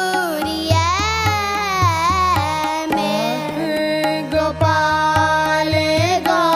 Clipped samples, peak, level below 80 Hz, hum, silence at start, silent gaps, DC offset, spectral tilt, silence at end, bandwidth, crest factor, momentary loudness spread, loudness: under 0.1%; -2 dBFS; -38 dBFS; none; 0 s; none; under 0.1%; -4.5 dB/octave; 0 s; 15.5 kHz; 16 dB; 5 LU; -17 LUFS